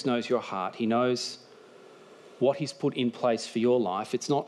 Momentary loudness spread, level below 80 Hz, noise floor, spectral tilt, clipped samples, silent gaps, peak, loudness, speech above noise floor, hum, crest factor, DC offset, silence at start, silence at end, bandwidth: 6 LU; -78 dBFS; -52 dBFS; -5 dB/octave; under 0.1%; none; -12 dBFS; -28 LUFS; 24 dB; none; 16 dB; under 0.1%; 0 s; 0 s; 12 kHz